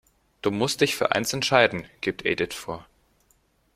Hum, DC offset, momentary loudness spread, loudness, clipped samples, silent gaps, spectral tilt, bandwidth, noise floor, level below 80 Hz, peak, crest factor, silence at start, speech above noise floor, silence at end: none; under 0.1%; 12 LU; -24 LUFS; under 0.1%; none; -3.5 dB/octave; 16 kHz; -65 dBFS; -58 dBFS; -2 dBFS; 24 dB; 0.45 s; 41 dB; 0.95 s